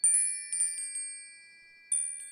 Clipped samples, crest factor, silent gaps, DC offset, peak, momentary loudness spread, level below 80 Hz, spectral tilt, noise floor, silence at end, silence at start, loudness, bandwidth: under 0.1%; 18 dB; none; under 0.1%; -14 dBFS; 16 LU; -80 dBFS; 5 dB/octave; -56 dBFS; 0 s; 0.05 s; -29 LUFS; 17.5 kHz